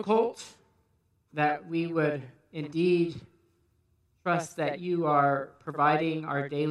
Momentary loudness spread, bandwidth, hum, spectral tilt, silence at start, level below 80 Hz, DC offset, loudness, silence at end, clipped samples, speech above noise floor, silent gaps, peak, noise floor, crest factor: 15 LU; 12 kHz; none; -6.5 dB/octave; 0 s; -74 dBFS; under 0.1%; -28 LUFS; 0 s; under 0.1%; 43 dB; none; -10 dBFS; -71 dBFS; 20 dB